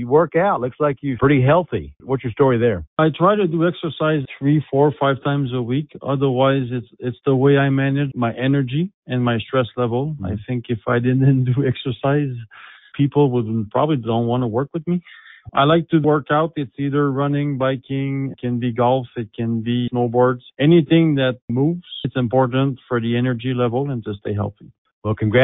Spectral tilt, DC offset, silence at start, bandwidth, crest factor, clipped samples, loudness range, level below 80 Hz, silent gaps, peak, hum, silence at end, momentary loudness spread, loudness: -12.5 dB/octave; under 0.1%; 0 s; 4 kHz; 16 dB; under 0.1%; 3 LU; -48 dBFS; 2.87-2.96 s, 8.94-9.02 s, 21.42-21.48 s, 24.78-24.85 s, 24.93-25.02 s; -2 dBFS; none; 0 s; 9 LU; -19 LUFS